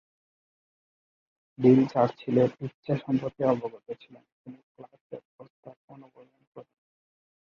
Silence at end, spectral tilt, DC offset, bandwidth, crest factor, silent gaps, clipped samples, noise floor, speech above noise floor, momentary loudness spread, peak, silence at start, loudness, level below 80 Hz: 0.85 s; -9.5 dB/octave; under 0.1%; 6.6 kHz; 22 dB; 2.74-2.83 s, 4.32-4.45 s, 4.63-4.75 s, 5.01-5.10 s, 5.25-5.39 s, 5.50-5.63 s, 5.77-5.88 s, 6.47-6.52 s; under 0.1%; under -90 dBFS; over 62 dB; 24 LU; -8 dBFS; 1.6 s; -26 LUFS; -68 dBFS